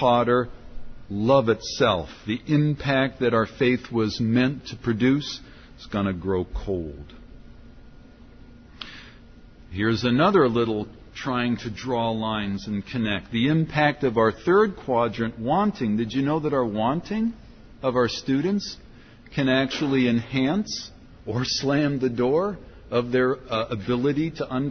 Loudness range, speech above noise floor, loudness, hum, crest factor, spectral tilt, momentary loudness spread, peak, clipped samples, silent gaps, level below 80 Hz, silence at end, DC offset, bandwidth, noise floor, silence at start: 6 LU; 24 dB; -24 LUFS; none; 18 dB; -6 dB/octave; 11 LU; -6 dBFS; under 0.1%; none; -46 dBFS; 0 s; under 0.1%; 6.6 kHz; -47 dBFS; 0 s